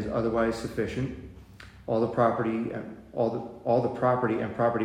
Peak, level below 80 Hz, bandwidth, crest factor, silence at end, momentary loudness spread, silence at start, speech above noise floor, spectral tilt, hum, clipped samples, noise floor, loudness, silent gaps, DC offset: -10 dBFS; -52 dBFS; 14.5 kHz; 18 dB; 0 s; 13 LU; 0 s; 21 dB; -7.5 dB/octave; none; under 0.1%; -48 dBFS; -28 LUFS; none; under 0.1%